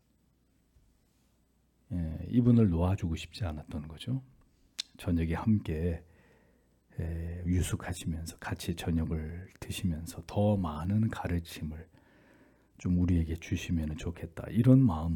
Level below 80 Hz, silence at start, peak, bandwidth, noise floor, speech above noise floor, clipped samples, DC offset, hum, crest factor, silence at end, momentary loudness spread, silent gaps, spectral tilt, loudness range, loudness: -48 dBFS; 1.9 s; -12 dBFS; 18 kHz; -70 dBFS; 40 dB; under 0.1%; under 0.1%; none; 20 dB; 0 s; 16 LU; none; -7 dB/octave; 4 LU; -32 LUFS